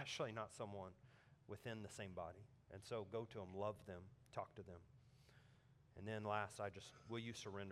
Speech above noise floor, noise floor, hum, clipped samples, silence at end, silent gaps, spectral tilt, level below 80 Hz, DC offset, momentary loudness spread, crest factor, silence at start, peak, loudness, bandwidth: 21 dB; -71 dBFS; none; under 0.1%; 0 s; none; -5 dB/octave; -80 dBFS; under 0.1%; 18 LU; 24 dB; 0 s; -28 dBFS; -51 LUFS; 15 kHz